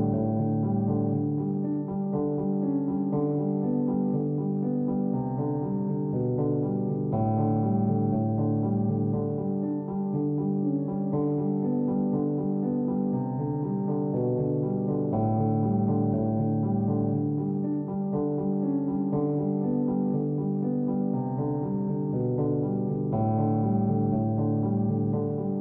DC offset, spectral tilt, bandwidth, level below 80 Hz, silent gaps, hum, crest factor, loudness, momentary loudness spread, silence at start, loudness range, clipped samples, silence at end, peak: under 0.1%; -15 dB/octave; 2.4 kHz; -56 dBFS; none; none; 12 dB; -27 LUFS; 4 LU; 0 s; 1 LU; under 0.1%; 0 s; -16 dBFS